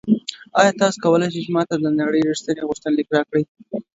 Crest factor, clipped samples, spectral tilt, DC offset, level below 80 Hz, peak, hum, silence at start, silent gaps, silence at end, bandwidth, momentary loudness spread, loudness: 20 dB; under 0.1%; -5.5 dB/octave; under 0.1%; -62 dBFS; 0 dBFS; none; 0.05 s; 3.48-3.55 s; 0.15 s; 8 kHz; 7 LU; -20 LUFS